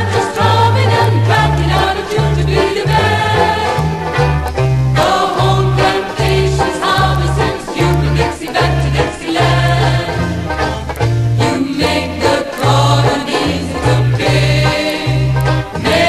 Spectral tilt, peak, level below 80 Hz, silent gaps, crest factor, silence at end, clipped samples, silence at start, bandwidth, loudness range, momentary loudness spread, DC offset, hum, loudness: -5.5 dB/octave; 0 dBFS; -26 dBFS; none; 12 dB; 0 s; under 0.1%; 0 s; 13 kHz; 2 LU; 5 LU; under 0.1%; none; -13 LUFS